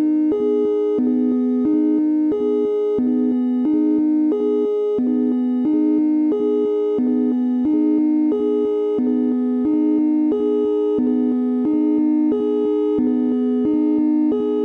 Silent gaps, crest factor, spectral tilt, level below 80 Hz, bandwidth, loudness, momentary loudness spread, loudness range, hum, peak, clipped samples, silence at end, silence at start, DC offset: none; 8 dB; -9 dB/octave; -62 dBFS; 4 kHz; -18 LUFS; 2 LU; 0 LU; none; -10 dBFS; under 0.1%; 0 s; 0 s; under 0.1%